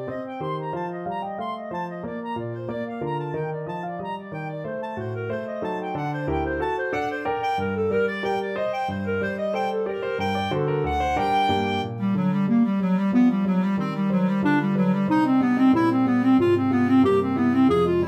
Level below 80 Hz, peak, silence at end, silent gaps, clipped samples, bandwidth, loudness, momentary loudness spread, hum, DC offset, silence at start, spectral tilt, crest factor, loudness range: -48 dBFS; -10 dBFS; 0 s; none; under 0.1%; 8.8 kHz; -24 LUFS; 12 LU; none; under 0.1%; 0 s; -8 dB/octave; 14 dB; 10 LU